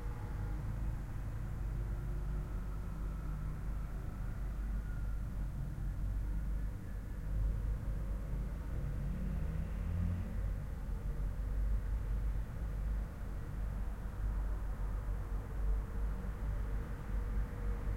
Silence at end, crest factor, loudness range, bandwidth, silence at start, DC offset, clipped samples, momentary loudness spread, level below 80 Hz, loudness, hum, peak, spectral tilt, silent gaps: 0 s; 12 dB; 2 LU; 8.2 kHz; 0 s; under 0.1%; under 0.1%; 4 LU; -38 dBFS; -42 LUFS; none; -26 dBFS; -8 dB/octave; none